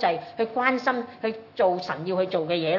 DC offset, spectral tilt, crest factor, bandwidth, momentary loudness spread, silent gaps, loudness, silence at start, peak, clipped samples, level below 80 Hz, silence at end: under 0.1%; -6.5 dB/octave; 18 dB; 6 kHz; 7 LU; none; -26 LUFS; 0 s; -6 dBFS; under 0.1%; -76 dBFS; 0 s